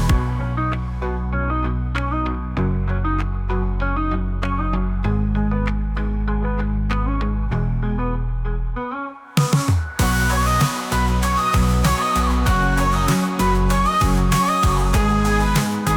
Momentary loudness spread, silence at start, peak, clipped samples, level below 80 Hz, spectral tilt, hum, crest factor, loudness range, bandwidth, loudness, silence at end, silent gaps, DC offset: 6 LU; 0 s; -6 dBFS; under 0.1%; -22 dBFS; -5.5 dB/octave; none; 12 dB; 5 LU; 19 kHz; -20 LUFS; 0 s; none; under 0.1%